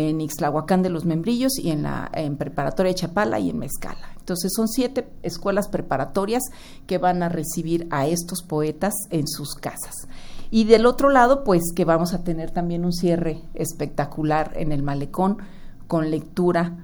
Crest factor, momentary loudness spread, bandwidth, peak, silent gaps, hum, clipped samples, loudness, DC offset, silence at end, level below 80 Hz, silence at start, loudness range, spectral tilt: 20 dB; 12 LU; over 20 kHz; -2 dBFS; none; none; under 0.1%; -23 LUFS; under 0.1%; 0 s; -38 dBFS; 0 s; 6 LU; -5.5 dB/octave